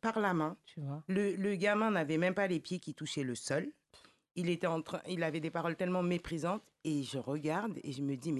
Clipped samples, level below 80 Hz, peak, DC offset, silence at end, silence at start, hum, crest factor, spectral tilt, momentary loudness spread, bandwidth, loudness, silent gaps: under 0.1%; -68 dBFS; -18 dBFS; under 0.1%; 0 s; 0.05 s; none; 18 dB; -6 dB/octave; 8 LU; 12 kHz; -36 LUFS; none